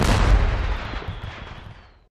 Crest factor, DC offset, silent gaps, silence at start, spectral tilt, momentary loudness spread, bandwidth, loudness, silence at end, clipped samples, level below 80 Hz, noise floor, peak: 16 dB; under 0.1%; none; 0 s; -5.5 dB/octave; 21 LU; 12.5 kHz; -24 LUFS; 0.35 s; under 0.1%; -24 dBFS; -43 dBFS; -6 dBFS